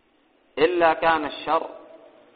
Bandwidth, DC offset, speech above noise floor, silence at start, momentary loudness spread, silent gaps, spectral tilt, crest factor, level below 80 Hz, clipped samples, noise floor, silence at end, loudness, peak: 4.9 kHz; under 0.1%; 40 dB; 0.55 s; 14 LU; none; -1.5 dB/octave; 20 dB; -58 dBFS; under 0.1%; -62 dBFS; 0.55 s; -22 LUFS; -6 dBFS